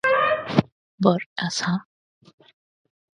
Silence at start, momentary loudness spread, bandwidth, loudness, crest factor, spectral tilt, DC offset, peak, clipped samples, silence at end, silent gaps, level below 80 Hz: 0.05 s; 7 LU; 10.5 kHz; -23 LUFS; 24 dB; -5 dB/octave; under 0.1%; -2 dBFS; under 0.1%; 1.35 s; 0.72-0.98 s, 1.26-1.36 s; -60 dBFS